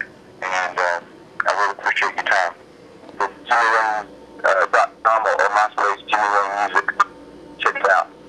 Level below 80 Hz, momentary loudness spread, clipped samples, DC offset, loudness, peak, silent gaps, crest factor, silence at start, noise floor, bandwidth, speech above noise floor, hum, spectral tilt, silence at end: -64 dBFS; 10 LU; under 0.1%; under 0.1%; -19 LUFS; -2 dBFS; none; 18 dB; 0 s; -43 dBFS; 11.5 kHz; 24 dB; none; -1.5 dB/octave; 0 s